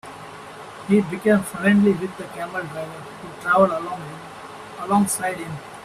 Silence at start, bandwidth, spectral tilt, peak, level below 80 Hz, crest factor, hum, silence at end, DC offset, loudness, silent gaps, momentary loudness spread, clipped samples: 0.05 s; 14 kHz; -5.5 dB/octave; -4 dBFS; -58 dBFS; 18 dB; none; 0 s; under 0.1%; -21 LUFS; none; 20 LU; under 0.1%